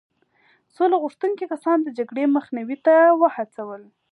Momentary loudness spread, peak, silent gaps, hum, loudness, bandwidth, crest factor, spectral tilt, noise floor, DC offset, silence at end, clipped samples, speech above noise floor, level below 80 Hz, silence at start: 16 LU; -4 dBFS; none; none; -20 LUFS; 10.5 kHz; 16 dB; -6.5 dB/octave; -61 dBFS; under 0.1%; 0.3 s; under 0.1%; 41 dB; -84 dBFS; 0.8 s